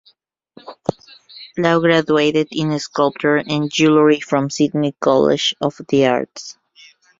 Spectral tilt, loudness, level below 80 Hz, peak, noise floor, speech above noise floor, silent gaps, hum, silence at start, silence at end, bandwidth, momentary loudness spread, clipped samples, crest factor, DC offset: -5 dB/octave; -17 LUFS; -58 dBFS; -2 dBFS; -58 dBFS; 42 dB; none; none; 0.65 s; 0.7 s; 7.8 kHz; 13 LU; under 0.1%; 16 dB; under 0.1%